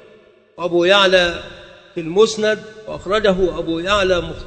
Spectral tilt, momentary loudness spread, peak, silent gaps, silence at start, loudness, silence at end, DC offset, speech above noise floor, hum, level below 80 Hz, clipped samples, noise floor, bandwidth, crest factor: -4 dB/octave; 18 LU; 0 dBFS; none; 0.6 s; -16 LUFS; 0 s; under 0.1%; 32 dB; none; -40 dBFS; under 0.1%; -48 dBFS; 9 kHz; 18 dB